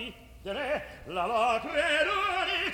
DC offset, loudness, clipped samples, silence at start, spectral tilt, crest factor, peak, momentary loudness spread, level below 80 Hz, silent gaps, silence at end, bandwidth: under 0.1%; -29 LUFS; under 0.1%; 0 s; -3 dB/octave; 16 dB; -14 dBFS; 12 LU; -54 dBFS; none; 0 s; 19.5 kHz